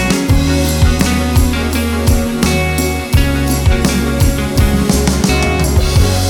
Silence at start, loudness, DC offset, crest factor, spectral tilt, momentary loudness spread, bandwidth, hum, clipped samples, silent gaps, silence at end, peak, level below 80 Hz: 0 s; -13 LUFS; under 0.1%; 10 dB; -5 dB/octave; 2 LU; 18.5 kHz; none; under 0.1%; none; 0 s; -2 dBFS; -16 dBFS